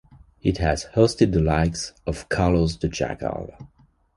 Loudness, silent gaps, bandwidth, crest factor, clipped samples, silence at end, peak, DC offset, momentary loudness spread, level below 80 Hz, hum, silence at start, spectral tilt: -23 LUFS; none; 11.5 kHz; 20 dB; under 0.1%; 0.5 s; -4 dBFS; under 0.1%; 11 LU; -34 dBFS; none; 0.45 s; -6 dB/octave